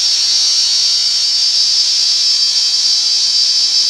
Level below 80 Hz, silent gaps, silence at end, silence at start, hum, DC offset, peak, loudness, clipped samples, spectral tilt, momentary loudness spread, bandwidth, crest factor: -58 dBFS; none; 0 s; 0 s; none; under 0.1%; -2 dBFS; -9 LUFS; under 0.1%; 4.5 dB/octave; 1 LU; 16 kHz; 10 dB